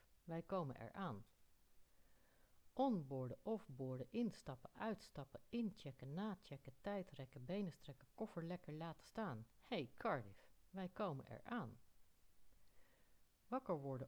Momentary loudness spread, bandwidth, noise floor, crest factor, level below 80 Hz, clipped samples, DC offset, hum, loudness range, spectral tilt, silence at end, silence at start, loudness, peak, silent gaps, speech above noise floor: 11 LU; over 20 kHz; -72 dBFS; 20 dB; -76 dBFS; under 0.1%; under 0.1%; none; 3 LU; -7.5 dB/octave; 0 s; 0.1 s; -49 LUFS; -30 dBFS; none; 24 dB